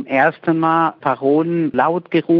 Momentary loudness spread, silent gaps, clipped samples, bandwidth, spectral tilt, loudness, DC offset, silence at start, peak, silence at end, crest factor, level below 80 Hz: 3 LU; none; under 0.1%; 5.2 kHz; -9.5 dB/octave; -17 LUFS; under 0.1%; 0 s; 0 dBFS; 0 s; 16 dB; -64 dBFS